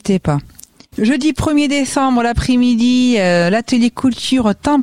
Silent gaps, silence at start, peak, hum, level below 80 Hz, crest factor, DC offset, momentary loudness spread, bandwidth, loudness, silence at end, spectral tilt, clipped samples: none; 0.05 s; -2 dBFS; none; -34 dBFS; 12 dB; 0.7%; 5 LU; 15 kHz; -14 LUFS; 0 s; -5.5 dB/octave; under 0.1%